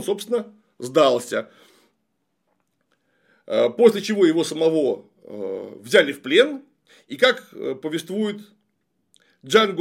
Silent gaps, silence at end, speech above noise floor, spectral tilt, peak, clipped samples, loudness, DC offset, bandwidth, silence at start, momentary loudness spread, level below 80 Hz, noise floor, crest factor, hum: none; 0 s; 54 dB; -4 dB/octave; -2 dBFS; under 0.1%; -21 LUFS; under 0.1%; 16 kHz; 0 s; 17 LU; -72 dBFS; -74 dBFS; 20 dB; none